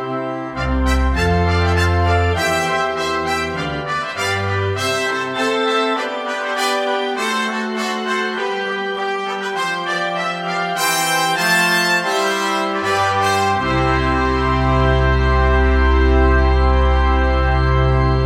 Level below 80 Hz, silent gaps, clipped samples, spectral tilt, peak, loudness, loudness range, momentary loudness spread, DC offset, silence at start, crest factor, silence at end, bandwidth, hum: -22 dBFS; none; under 0.1%; -5 dB/octave; -2 dBFS; -17 LUFS; 5 LU; 6 LU; under 0.1%; 0 s; 14 dB; 0 s; 16 kHz; none